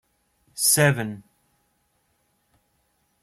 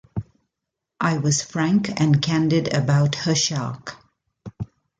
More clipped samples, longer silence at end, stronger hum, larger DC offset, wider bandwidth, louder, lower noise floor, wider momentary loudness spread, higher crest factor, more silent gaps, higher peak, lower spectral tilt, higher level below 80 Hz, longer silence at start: neither; first, 2.05 s vs 0.35 s; neither; neither; first, 16 kHz vs 9.2 kHz; about the same, -20 LUFS vs -21 LUFS; second, -70 dBFS vs -83 dBFS; first, 24 LU vs 16 LU; first, 22 dB vs 16 dB; neither; about the same, -6 dBFS vs -6 dBFS; second, -3 dB/octave vs -5 dB/octave; second, -64 dBFS vs -52 dBFS; first, 0.55 s vs 0.15 s